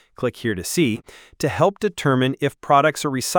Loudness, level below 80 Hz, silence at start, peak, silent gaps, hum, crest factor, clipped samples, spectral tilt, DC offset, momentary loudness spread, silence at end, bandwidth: -21 LUFS; -54 dBFS; 0.2 s; -2 dBFS; none; none; 18 dB; under 0.1%; -5 dB/octave; under 0.1%; 9 LU; 0 s; over 20 kHz